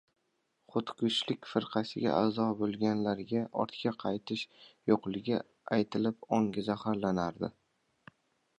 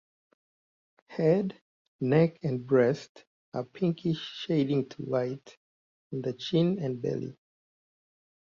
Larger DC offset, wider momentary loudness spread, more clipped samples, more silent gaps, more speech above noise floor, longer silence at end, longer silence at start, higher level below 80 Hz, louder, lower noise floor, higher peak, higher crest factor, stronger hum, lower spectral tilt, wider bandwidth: neither; second, 6 LU vs 13 LU; neither; second, none vs 1.61-1.99 s, 3.09-3.15 s, 3.27-3.52 s, 5.57-6.10 s; second, 46 dB vs over 62 dB; about the same, 1.1 s vs 1.15 s; second, 0.75 s vs 1.1 s; about the same, -68 dBFS vs -70 dBFS; second, -33 LUFS vs -29 LUFS; second, -78 dBFS vs under -90 dBFS; about the same, -12 dBFS vs -12 dBFS; about the same, 20 dB vs 18 dB; neither; second, -6.5 dB/octave vs -8 dB/octave; first, 9.6 kHz vs 7.4 kHz